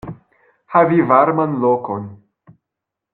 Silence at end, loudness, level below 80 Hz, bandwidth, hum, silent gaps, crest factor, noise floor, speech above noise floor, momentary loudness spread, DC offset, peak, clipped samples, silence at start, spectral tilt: 1 s; -16 LUFS; -56 dBFS; 4.2 kHz; none; none; 18 dB; -82 dBFS; 67 dB; 17 LU; under 0.1%; 0 dBFS; under 0.1%; 0.05 s; -11 dB/octave